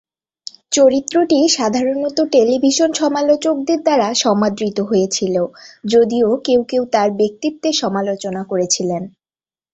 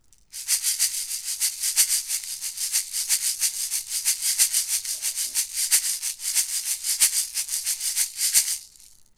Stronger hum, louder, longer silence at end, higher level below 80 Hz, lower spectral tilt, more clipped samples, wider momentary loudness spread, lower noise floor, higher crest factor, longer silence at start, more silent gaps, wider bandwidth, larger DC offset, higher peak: neither; first, -16 LUFS vs -22 LUFS; first, 0.65 s vs 0.25 s; first, -58 dBFS vs -64 dBFS; first, -4 dB/octave vs 5 dB/octave; neither; about the same, 8 LU vs 8 LU; first, under -90 dBFS vs -52 dBFS; second, 14 dB vs 24 dB; first, 0.7 s vs 0.35 s; neither; second, 8.4 kHz vs 18 kHz; neither; about the same, -2 dBFS vs -2 dBFS